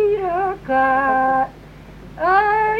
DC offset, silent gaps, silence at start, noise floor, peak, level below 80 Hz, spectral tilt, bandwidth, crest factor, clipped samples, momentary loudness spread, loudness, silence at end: under 0.1%; none; 0 s; -40 dBFS; -4 dBFS; -44 dBFS; -6.5 dB/octave; 6.4 kHz; 14 dB; under 0.1%; 8 LU; -18 LUFS; 0 s